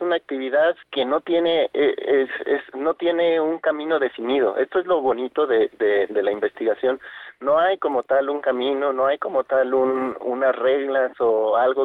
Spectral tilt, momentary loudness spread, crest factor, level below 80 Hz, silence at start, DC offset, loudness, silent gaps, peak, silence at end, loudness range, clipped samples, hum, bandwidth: -6.5 dB/octave; 4 LU; 10 dB; -66 dBFS; 0 s; under 0.1%; -21 LUFS; none; -10 dBFS; 0 s; 1 LU; under 0.1%; none; 4.3 kHz